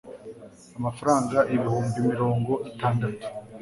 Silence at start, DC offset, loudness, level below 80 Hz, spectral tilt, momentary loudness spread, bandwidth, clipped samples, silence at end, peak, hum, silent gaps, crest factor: 0.05 s; under 0.1%; -25 LUFS; -56 dBFS; -7 dB/octave; 20 LU; 11.5 kHz; under 0.1%; 0 s; -6 dBFS; none; none; 20 dB